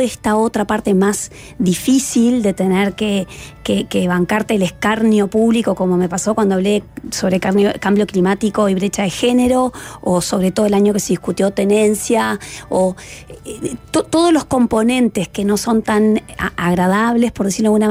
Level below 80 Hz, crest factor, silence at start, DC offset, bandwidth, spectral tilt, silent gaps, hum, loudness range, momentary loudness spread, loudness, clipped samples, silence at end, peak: -44 dBFS; 10 dB; 0 s; under 0.1%; 16 kHz; -5 dB/octave; none; none; 1 LU; 7 LU; -16 LUFS; under 0.1%; 0 s; -4 dBFS